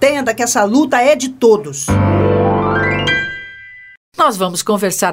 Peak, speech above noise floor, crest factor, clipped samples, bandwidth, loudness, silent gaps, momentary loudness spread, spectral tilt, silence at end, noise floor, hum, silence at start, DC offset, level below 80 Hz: 0 dBFS; 22 dB; 14 dB; under 0.1%; 16.5 kHz; -14 LUFS; 3.97-4.12 s; 8 LU; -4.5 dB/octave; 0 s; -36 dBFS; none; 0 s; under 0.1%; -38 dBFS